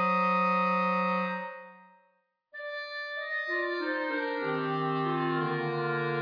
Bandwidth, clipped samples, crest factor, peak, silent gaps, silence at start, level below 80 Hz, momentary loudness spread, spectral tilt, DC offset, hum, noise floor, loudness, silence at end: 5.2 kHz; under 0.1%; 14 dB; -16 dBFS; none; 0 s; -88 dBFS; 12 LU; -7.5 dB/octave; under 0.1%; none; -72 dBFS; -30 LUFS; 0 s